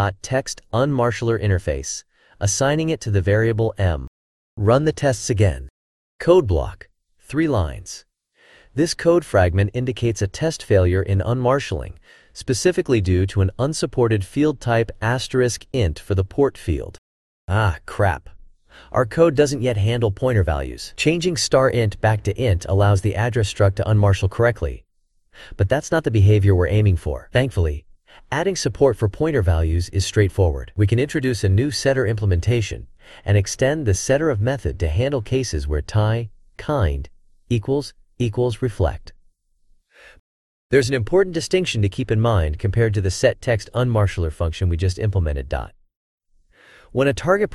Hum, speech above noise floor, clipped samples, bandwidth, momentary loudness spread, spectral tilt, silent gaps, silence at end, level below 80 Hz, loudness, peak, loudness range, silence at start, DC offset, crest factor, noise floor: none; 42 dB; under 0.1%; 12.5 kHz; 9 LU; -6 dB/octave; 4.07-4.57 s, 5.70-6.19 s, 16.98-17.48 s, 40.19-40.70 s, 45.96-46.18 s; 0 s; -36 dBFS; -20 LUFS; -2 dBFS; 4 LU; 0 s; under 0.1%; 18 dB; -61 dBFS